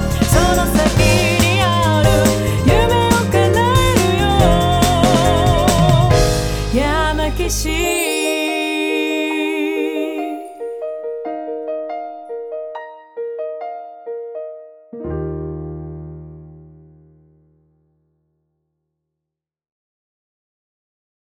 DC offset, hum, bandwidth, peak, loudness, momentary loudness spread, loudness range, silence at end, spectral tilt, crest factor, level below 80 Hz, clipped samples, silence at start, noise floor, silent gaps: under 0.1%; none; over 20 kHz; -2 dBFS; -16 LUFS; 17 LU; 16 LU; 4.6 s; -5 dB/octave; 16 dB; -26 dBFS; under 0.1%; 0 s; -84 dBFS; none